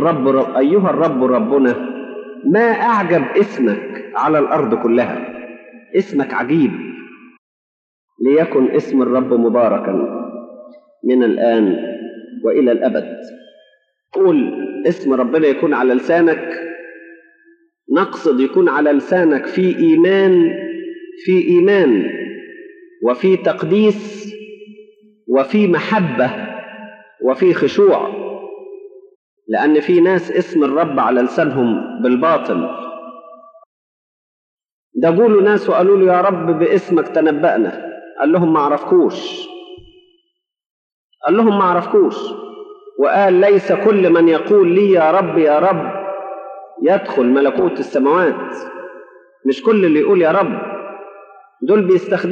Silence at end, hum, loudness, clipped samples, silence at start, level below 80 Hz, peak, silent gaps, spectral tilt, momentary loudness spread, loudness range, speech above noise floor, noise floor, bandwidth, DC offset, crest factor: 0 s; none; -14 LUFS; under 0.1%; 0 s; -68 dBFS; -2 dBFS; 7.38-8.08 s, 29.15-29.37 s, 33.66-34.57 s, 34.72-34.91 s, 40.66-41.10 s; -8 dB/octave; 18 LU; 5 LU; 54 dB; -68 dBFS; 7.2 kHz; under 0.1%; 14 dB